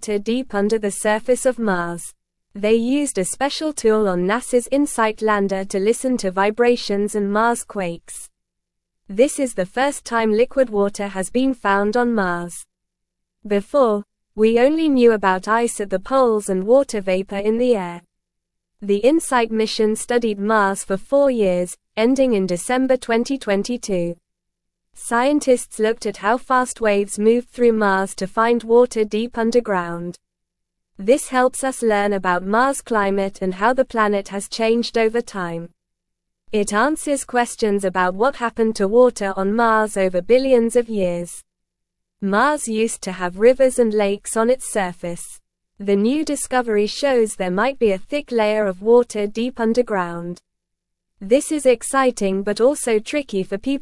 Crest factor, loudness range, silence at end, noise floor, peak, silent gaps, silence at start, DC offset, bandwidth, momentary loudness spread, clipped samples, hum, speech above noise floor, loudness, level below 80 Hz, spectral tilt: 18 dB; 3 LU; 0 s; -79 dBFS; -2 dBFS; none; 0 s; under 0.1%; 12 kHz; 9 LU; under 0.1%; none; 60 dB; -19 LUFS; -50 dBFS; -4.5 dB/octave